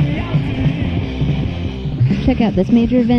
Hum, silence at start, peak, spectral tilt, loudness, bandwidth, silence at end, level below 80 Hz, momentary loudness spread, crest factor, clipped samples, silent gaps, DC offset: none; 0 s; -2 dBFS; -9 dB/octave; -17 LUFS; 6.4 kHz; 0 s; -28 dBFS; 7 LU; 14 dB; under 0.1%; none; under 0.1%